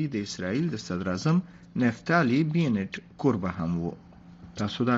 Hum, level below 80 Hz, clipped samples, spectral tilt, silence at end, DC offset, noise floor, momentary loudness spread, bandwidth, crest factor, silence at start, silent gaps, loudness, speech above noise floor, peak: none; -58 dBFS; under 0.1%; -6 dB/octave; 0 s; under 0.1%; -48 dBFS; 11 LU; 7.8 kHz; 20 dB; 0 s; none; -28 LUFS; 21 dB; -8 dBFS